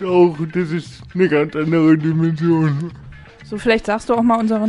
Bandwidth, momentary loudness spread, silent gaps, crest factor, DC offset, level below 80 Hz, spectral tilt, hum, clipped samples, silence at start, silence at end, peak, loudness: 11 kHz; 11 LU; none; 14 dB; under 0.1%; -46 dBFS; -8 dB/octave; none; under 0.1%; 0 s; 0 s; -2 dBFS; -17 LUFS